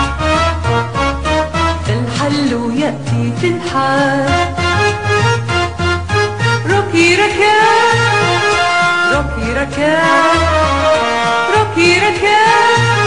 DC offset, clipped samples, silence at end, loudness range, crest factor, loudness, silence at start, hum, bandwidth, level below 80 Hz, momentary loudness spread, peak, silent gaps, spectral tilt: 1%; under 0.1%; 0 s; 4 LU; 12 dB; -12 LUFS; 0 s; none; 11 kHz; -32 dBFS; 7 LU; 0 dBFS; none; -4.5 dB/octave